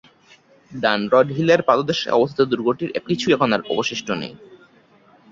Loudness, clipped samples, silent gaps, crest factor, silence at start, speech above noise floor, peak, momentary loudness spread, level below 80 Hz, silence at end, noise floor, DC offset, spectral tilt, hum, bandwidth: -19 LUFS; under 0.1%; none; 18 dB; 0.7 s; 34 dB; -2 dBFS; 9 LU; -60 dBFS; 0.75 s; -53 dBFS; under 0.1%; -5.5 dB/octave; none; 7.6 kHz